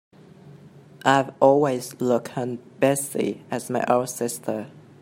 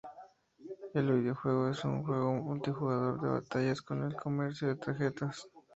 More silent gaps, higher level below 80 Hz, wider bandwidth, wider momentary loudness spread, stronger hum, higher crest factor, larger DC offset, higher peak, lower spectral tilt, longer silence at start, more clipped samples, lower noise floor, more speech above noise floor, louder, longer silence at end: neither; about the same, -70 dBFS vs -70 dBFS; first, 16 kHz vs 8 kHz; first, 12 LU vs 9 LU; neither; first, 22 dB vs 16 dB; neither; first, -2 dBFS vs -18 dBFS; second, -5 dB/octave vs -7.5 dB/octave; first, 0.45 s vs 0.05 s; neither; second, -47 dBFS vs -57 dBFS; about the same, 25 dB vs 24 dB; first, -23 LUFS vs -34 LUFS; about the same, 0.2 s vs 0.15 s